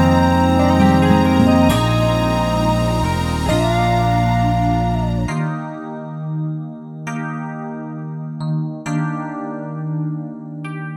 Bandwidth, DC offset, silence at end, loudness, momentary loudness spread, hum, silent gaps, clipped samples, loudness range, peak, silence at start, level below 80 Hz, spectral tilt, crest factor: 17 kHz; under 0.1%; 0 s; -18 LUFS; 15 LU; none; none; under 0.1%; 10 LU; 0 dBFS; 0 s; -32 dBFS; -7 dB/octave; 16 dB